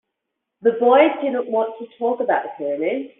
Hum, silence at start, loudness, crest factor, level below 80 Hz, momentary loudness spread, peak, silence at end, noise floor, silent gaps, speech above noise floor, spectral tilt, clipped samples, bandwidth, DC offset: none; 0.65 s; -20 LUFS; 18 dB; -72 dBFS; 11 LU; -2 dBFS; 0.15 s; -80 dBFS; none; 61 dB; -2.5 dB/octave; under 0.1%; 3.9 kHz; under 0.1%